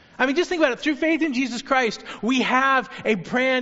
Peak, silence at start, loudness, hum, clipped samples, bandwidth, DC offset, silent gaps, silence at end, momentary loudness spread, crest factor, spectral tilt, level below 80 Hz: -4 dBFS; 0.2 s; -22 LUFS; none; under 0.1%; 8 kHz; under 0.1%; none; 0 s; 6 LU; 18 dB; -2 dB/octave; -58 dBFS